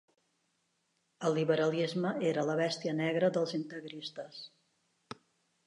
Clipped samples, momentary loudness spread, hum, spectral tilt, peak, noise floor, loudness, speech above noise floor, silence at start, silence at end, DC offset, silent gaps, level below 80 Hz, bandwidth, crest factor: under 0.1%; 21 LU; none; -6 dB/octave; -16 dBFS; -78 dBFS; -33 LUFS; 46 dB; 1.2 s; 0.5 s; under 0.1%; none; -84 dBFS; 11 kHz; 18 dB